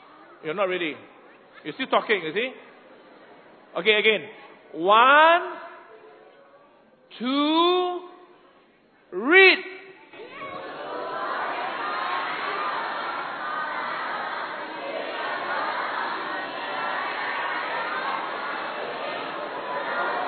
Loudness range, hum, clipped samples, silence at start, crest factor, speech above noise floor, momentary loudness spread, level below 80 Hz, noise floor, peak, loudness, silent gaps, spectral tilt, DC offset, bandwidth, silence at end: 8 LU; none; under 0.1%; 0.1 s; 22 dB; 38 dB; 19 LU; -78 dBFS; -58 dBFS; -2 dBFS; -24 LUFS; none; -7.5 dB/octave; under 0.1%; 4.6 kHz; 0 s